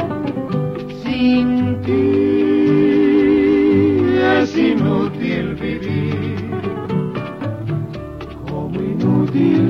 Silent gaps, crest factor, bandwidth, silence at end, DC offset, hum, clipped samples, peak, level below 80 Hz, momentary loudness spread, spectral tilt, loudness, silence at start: none; 14 dB; 6.6 kHz; 0 s; under 0.1%; none; under 0.1%; -2 dBFS; -42 dBFS; 11 LU; -8.5 dB/octave; -17 LUFS; 0 s